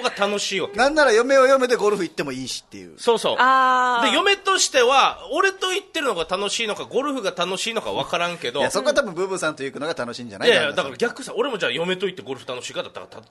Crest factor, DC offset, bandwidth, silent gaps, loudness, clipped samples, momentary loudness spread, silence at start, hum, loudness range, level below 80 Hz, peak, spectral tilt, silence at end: 18 dB; under 0.1%; 12.5 kHz; none; -20 LUFS; under 0.1%; 13 LU; 0 s; none; 5 LU; -58 dBFS; -2 dBFS; -2.5 dB/octave; 0.1 s